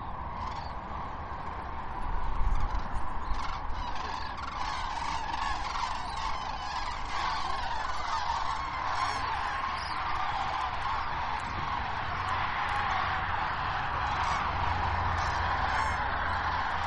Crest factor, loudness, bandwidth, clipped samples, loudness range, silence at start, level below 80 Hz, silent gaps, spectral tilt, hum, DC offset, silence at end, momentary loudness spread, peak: 16 dB; -32 LUFS; 10.5 kHz; under 0.1%; 6 LU; 0 s; -38 dBFS; none; -4 dB/octave; none; under 0.1%; 0 s; 8 LU; -14 dBFS